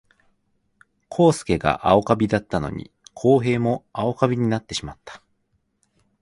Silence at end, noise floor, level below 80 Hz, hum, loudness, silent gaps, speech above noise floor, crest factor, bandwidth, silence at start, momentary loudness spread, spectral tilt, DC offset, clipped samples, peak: 1.05 s; -70 dBFS; -46 dBFS; none; -21 LUFS; none; 49 dB; 22 dB; 11.5 kHz; 1.1 s; 13 LU; -6.5 dB/octave; under 0.1%; under 0.1%; -2 dBFS